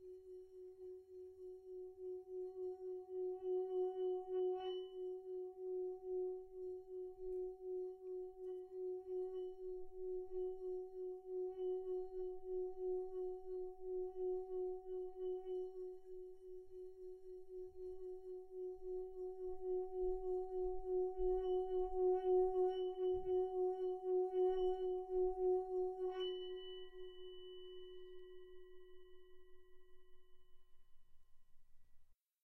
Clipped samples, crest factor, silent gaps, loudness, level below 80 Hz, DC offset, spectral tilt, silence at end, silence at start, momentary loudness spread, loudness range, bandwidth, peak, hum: under 0.1%; 16 dB; none; -44 LUFS; -64 dBFS; under 0.1%; -7.5 dB/octave; 0.3 s; 0 s; 17 LU; 13 LU; 3.2 kHz; -28 dBFS; none